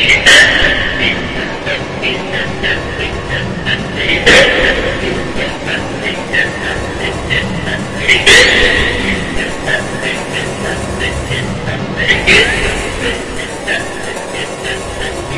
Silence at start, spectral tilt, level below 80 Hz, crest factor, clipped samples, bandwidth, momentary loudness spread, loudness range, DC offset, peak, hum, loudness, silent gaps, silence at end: 0 s; -3 dB/octave; -28 dBFS; 14 dB; 0.5%; 12 kHz; 13 LU; 6 LU; under 0.1%; 0 dBFS; none; -12 LUFS; none; 0 s